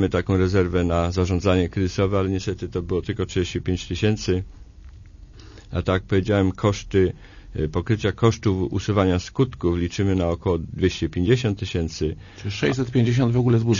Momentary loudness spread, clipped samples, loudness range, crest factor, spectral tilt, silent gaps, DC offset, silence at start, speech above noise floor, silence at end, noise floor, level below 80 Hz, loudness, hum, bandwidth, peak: 7 LU; under 0.1%; 3 LU; 16 dB; -7 dB/octave; none; under 0.1%; 0 s; 22 dB; 0 s; -43 dBFS; -40 dBFS; -23 LUFS; none; 7.4 kHz; -6 dBFS